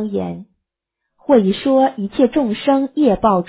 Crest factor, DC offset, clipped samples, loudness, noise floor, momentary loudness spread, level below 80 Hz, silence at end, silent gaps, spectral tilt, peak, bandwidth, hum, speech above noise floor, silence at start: 14 dB; under 0.1%; under 0.1%; -16 LUFS; -79 dBFS; 12 LU; -48 dBFS; 0.05 s; none; -11 dB/octave; -2 dBFS; 4 kHz; none; 63 dB; 0 s